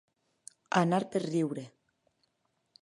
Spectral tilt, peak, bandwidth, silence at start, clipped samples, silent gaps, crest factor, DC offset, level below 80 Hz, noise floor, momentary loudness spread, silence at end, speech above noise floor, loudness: -6 dB/octave; -10 dBFS; 11.5 kHz; 0.7 s; under 0.1%; none; 24 dB; under 0.1%; -80 dBFS; -78 dBFS; 13 LU; 1.15 s; 49 dB; -31 LUFS